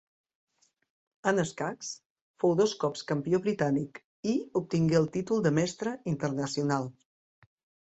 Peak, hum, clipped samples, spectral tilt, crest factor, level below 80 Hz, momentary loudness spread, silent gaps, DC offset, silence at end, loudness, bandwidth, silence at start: -12 dBFS; none; under 0.1%; -6 dB/octave; 20 dB; -66 dBFS; 9 LU; 2.06-2.16 s, 2.22-2.34 s, 4.04-4.23 s; under 0.1%; 0.9 s; -30 LUFS; 8.2 kHz; 1.25 s